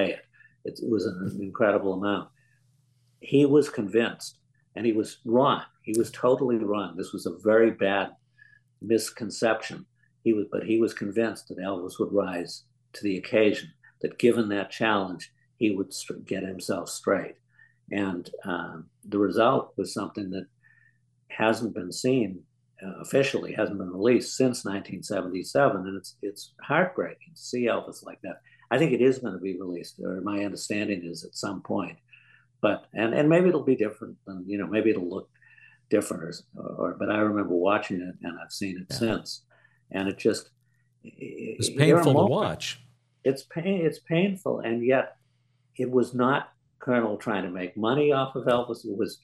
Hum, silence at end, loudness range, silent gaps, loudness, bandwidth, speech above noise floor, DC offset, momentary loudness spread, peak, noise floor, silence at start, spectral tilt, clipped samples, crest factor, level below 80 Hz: none; 0.05 s; 5 LU; none; -27 LUFS; 13 kHz; 42 dB; under 0.1%; 16 LU; -4 dBFS; -68 dBFS; 0 s; -5.5 dB/octave; under 0.1%; 22 dB; -70 dBFS